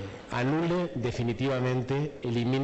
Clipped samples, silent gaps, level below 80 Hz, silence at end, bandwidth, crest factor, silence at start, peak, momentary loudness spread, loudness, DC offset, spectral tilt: under 0.1%; none; -54 dBFS; 0 s; 8.4 kHz; 10 dB; 0 s; -20 dBFS; 4 LU; -29 LUFS; under 0.1%; -7.5 dB/octave